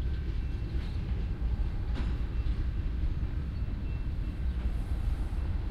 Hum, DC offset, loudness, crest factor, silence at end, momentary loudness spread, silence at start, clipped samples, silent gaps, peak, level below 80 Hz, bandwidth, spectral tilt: none; under 0.1%; -35 LUFS; 12 dB; 0 s; 2 LU; 0 s; under 0.1%; none; -20 dBFS; -32 dBFS; 5.6 kHz; -8 dB/octave